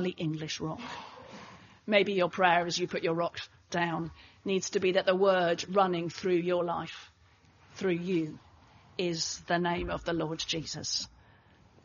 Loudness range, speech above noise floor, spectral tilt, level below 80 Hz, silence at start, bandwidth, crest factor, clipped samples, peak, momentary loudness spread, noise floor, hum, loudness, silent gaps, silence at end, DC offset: 5 LU; 32 dB; -3.5 dB/octave; -60 dBFS; 0 s; 7.2 kHz; 22 dB; under 0.1%; -10 dBFS; 17 LU; -62 dBFS; none; -30 LUFS; none; 0.75 s; under 0.1%